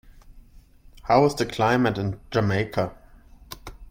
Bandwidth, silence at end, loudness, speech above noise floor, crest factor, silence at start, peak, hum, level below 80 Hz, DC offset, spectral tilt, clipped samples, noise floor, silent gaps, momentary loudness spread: 16.5 kHz; 0 s; -23 LUFS; 28 dB; 20 dB; 0.3 s; -6 dBFS; none; -48 dBFS; under 0.1%; -6 dB/octave; under 0.1%; -50 dBFS; none; 21 LU